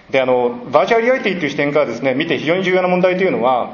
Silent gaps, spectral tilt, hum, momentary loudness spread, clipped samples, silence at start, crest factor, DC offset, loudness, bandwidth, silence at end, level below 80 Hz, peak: none; -6 dB/octave; none; 4 LU; under 0.1%; 0.1 s; 16 dB; under 0.1%; -16 LUFS; 7 kHz; 0 s; -56 dBFS; 0 dBFS